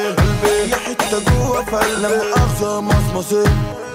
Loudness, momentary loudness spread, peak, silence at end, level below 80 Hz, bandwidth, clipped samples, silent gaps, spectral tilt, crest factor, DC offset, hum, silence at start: -17 LUFS; 3 LU; -6 dBFS; 0 s; -26 dBFS; 16 kHz; under 0.1%; none; -5 dB/octave; 10 dB; under 0.1%; none; 0 s